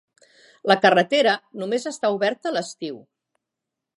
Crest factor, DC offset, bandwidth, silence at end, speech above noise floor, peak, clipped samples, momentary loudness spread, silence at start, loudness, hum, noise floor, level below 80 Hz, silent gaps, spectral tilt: 22 dB; under 0.1%; 11.5 kHz; 1 s; 63 dB; -2 dBFS; under 0.1%; 16 LU; 0.65 s; -21 LUFS; none; -84 dBFS; -78 dBFS; none; -4 dB/octave